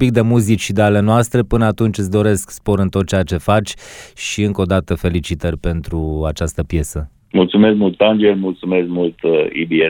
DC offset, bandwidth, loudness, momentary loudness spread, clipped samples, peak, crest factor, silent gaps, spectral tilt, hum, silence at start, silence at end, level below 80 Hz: under 0.1%; 18.5 kHz; -16 LUFS; 9 LU; under 0.1%; 0 dBFS; 16 dB; none; -6 dB/octave; none; 0 s; 0 s; -32 dBFS